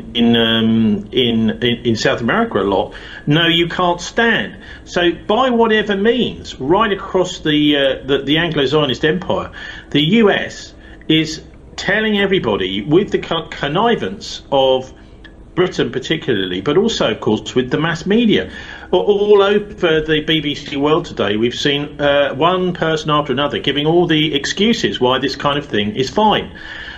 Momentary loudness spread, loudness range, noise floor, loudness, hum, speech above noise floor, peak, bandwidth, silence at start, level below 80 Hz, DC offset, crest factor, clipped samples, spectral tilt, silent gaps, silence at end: 9 LU; 2 LU; -38 dBFS; -16 LUFS; none; 23 dB; 0 dBFS; 13 kHz; 0 s; -42 dBFS; under 0.1%; 14 dB; under 0.1%; -5 dB/octave; none; 0 s